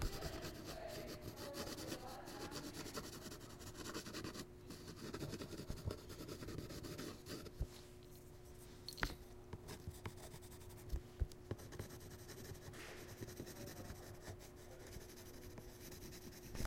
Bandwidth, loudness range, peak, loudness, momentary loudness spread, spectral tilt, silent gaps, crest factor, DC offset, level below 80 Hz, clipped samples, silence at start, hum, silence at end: 16.5 kHz; 4 LU; -18 dBFS; -51 LUFS; 8 LU; -4.5 dB/octave; none; 32 dB; under 0.1%; -56 dBFS; under 0.1%; 0 s; none; 0 s